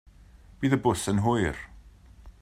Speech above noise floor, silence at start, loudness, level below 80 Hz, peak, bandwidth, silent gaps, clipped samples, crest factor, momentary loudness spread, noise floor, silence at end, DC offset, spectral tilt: 27 dB; 0.6 s; -26 LUFS; -48 dBFS; -10 dBFS; 15 kHz; none; under 0.1%; 18 dB; 13 LU; -52 dBFS; 0.1 s; under 0.1%; -6 dB/octave